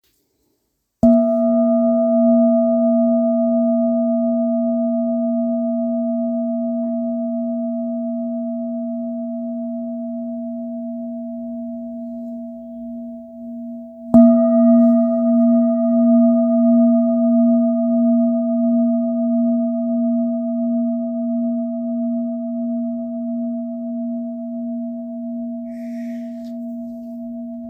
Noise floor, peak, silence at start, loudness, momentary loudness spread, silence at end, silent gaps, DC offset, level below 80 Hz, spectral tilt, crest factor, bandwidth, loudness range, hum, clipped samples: -70 dBFS; 0 dBFS; 1.05 s; -18 LUFS; 16 LU; 0 s; none; under 0.1%; -58 dBFS; -11.5 dB/octave; 18 dB; 2 kHz; 13 LU; none; under 0.1%